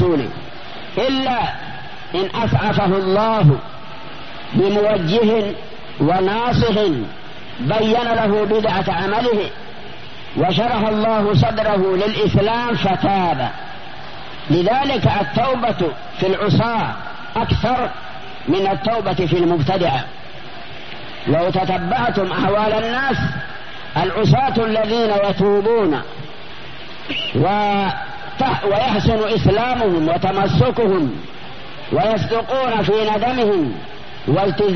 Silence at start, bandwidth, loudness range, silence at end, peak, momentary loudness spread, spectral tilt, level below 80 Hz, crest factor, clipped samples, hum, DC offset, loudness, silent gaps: 0 s; 6.4 kHz; 2 LU; 0 s; 0 dBFS; 17 LU; -5 dB/octave; -40 dBFS; 18 dB; under 0.1%; none; 3%; -18 LUFS; none